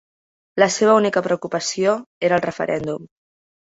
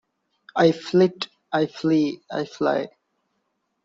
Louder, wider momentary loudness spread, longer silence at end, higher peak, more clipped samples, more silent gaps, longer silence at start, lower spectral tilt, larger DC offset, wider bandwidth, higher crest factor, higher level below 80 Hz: first, -19 LUFS vs -23 LUFS; about the same, 11 LU vs 11 LU; second, 0.55 s vs 1 s; about the same, -2 dBFS vs -4 dBFS; neither; first, 2.06-2.21 s vs none; about the same, 0.55 s vs 0.55 s; second, -4 dB/octave vs -6.5 dB/octave; neither; about the same, 8 kHz vs 7.6 kHz; about the same, 20 dB vs 20 dB; first, -60 dBFS vs -66 dBFS